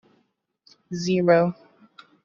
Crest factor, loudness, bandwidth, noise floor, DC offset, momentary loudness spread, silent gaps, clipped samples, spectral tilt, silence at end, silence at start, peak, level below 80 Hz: 20 dB; -22 LUFS; 7.4 kHz; -70 dBFS; under 0.1%; 18 LU; none; under 0.1%; -6 dB/octave; 0.7 s; 0.9 s; -6 dBFS; -64 dBFS